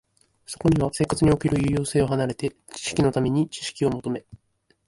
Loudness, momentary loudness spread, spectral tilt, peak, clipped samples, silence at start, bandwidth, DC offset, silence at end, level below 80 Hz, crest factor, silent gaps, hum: -24 LUFS; 11 LU; -6 dB/octave; -8 dBFS; under 0.1%; 0.5 s; 11.5 kHz; under 0.1%; 0.5 s; -44 dBFS; 16 dB; none; none